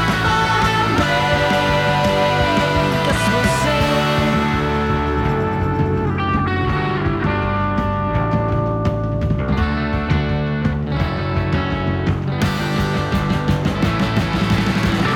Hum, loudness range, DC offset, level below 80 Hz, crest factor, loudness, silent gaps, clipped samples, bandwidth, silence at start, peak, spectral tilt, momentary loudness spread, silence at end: none; 4 LU; under 0.1%; -30 dBFS; 14 dB; -18 LUFS; none; under 0.1%; 17 kHz; 0 s; -4 dBFS; -6 dB/octave; 4 LU; 0 s